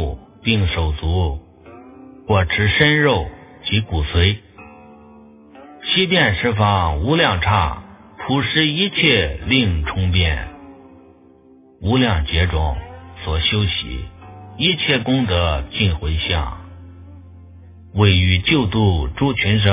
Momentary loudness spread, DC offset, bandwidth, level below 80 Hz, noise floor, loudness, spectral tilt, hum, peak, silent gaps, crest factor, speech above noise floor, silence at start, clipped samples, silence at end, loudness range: 14 LU; under 0.1%; 3.9 kHz; -28 dBFS; -48 dBFS; -17 LUFS; -9.5 dB/octave; none; 0 dBFS; none; 18 dB; 31 dB; 0 s; under 0.1%; 0 s; 4 LU